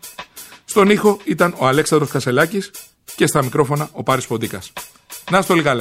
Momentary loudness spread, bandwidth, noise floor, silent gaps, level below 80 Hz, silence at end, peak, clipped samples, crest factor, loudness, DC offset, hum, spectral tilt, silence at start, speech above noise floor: 20 LU; 16.5 kHz; -38 dBFS; none; -54 dBFS; 0 s; -2 dBFS; under 0.1%; 16 dB; -17 LUFS; under 0.1%; none; -5 dB/octave; 0.05 s; 21 dB